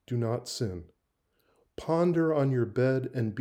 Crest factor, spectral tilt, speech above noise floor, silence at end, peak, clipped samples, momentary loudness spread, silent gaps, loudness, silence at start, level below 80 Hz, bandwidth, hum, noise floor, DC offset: 16 dB; -7 dB/octave; 47 dB; 0 s; -14 dBFS; under 0.1%; 13 LU; none; -29 LUFS; 0.1 s; -64 dBFS; 14 kHz; none; -75 dBFS; under 0.1%